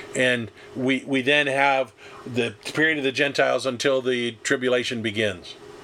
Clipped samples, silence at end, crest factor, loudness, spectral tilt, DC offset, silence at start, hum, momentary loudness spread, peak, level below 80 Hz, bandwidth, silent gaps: under 0.1%; 0 s; 20 dB; -23 LUFS; -4 dB/octave; under 0.1%; 0 s; none; 10 LU; -4 dBFS; -66 dBFS; 15 kHz; none